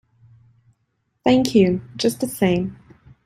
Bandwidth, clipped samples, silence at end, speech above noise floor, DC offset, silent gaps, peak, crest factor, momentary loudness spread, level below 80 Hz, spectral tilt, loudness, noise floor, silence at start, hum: 16 kHz; under 0.1%; 0.5 s; 53 dB; under 0.1%; none; -2 dBFS; 20 dB; 8 LU; -52 dBFS; -6 dB/octave; -20 LUFS; -71 dBFS; 1.25 s; none